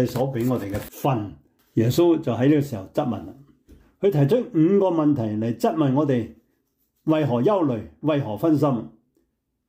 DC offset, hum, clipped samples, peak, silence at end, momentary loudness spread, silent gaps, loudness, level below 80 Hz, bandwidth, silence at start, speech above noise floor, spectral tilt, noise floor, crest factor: under 0.1%; none; under 0.1%; -8 dBFS; 0.8 s; 10 LU; none; -22 LUFS; -56 dBFS; 16 kHz; 0 s; 51 dB; -8 dB/octave; -72 dBFS; 14 dB